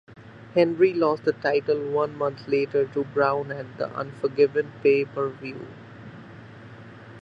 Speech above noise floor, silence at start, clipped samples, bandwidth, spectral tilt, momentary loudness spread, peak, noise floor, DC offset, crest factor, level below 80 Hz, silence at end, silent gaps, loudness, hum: 20 dB; 0.15 s; under 0.1%; 6.4 kHz; -8 dB/octave; 23 LU; -6 dBFS; -44 dBFS; under 0.1%; 18 dB; -64 dBFS; 0 s; none; -24 LUFS; none